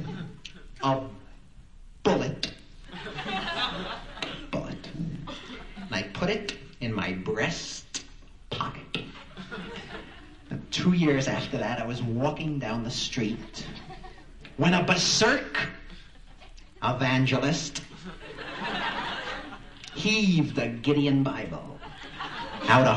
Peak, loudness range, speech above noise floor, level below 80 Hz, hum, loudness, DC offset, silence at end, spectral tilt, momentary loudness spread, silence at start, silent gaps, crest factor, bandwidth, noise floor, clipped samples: -6 dBFS; 7 LU; 24 dB; -48 dBFS; none; -28 LUFS; 0.2%; 0 s; -4.5 dB/octave; 20 LU; 0 s; none; 24 dB; 11 kHz; -50 dBFS; under 0.1%